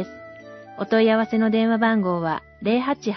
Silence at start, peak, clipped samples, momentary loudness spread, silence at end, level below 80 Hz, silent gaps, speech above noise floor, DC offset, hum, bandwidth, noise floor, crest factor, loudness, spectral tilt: 0 s; -6 dBFS; under 0.1%; 22 LU; 0 s; -60 dBFS; none; 21 dB; under 0.1%; none; 6.2 kHz; -41 dBFS; 14 dB; -21 LUFS; -7 dB/octave